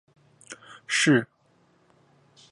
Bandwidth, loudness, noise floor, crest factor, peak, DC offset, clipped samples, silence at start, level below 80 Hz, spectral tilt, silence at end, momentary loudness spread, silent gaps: 11.5 kHz; -23 LUFS; -64 dBFS; 20 dB; -8 dBFS; under 0.1%; under 0.1%; 0.5 s; -76 dBFS; -4 dB/octave; 1.25 s; 24 LU; none